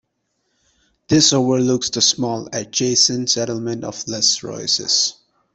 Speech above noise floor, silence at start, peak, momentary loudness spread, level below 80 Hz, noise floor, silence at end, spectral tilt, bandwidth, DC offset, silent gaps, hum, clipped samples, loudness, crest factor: 52 dB; 1.1 s; -2 dBFS; 11 LU; -56 dBFS; -71 dBFS; 0.4 s; -3 dB/octave; 8.4 kHz; under 0.1%; none; none; under 0.1%; -17 LUFS; 18 dB